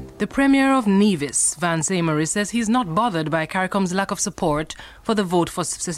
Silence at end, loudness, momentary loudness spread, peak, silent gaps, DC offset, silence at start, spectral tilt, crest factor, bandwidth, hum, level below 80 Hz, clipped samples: 0 s; -20 LUFS; 7 LU; -4 dBFS; none; under 0.1%; 0 s; -4 dB/octave; 16 dB; 15.5 kHz; none; -48 dBFS; under 0.1%